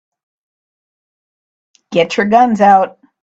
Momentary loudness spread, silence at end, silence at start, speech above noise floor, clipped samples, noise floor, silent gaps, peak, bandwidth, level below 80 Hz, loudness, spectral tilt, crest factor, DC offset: 9 LU; 0.35 s; 1.9 s; over 79 dB; under 0.1%; under -90 dBFS; none; 0 dBFS; 7.8 kHz; -60 dBFS; -12 LUFS; -5.5 dB/octave; 16 dB; under 0.1%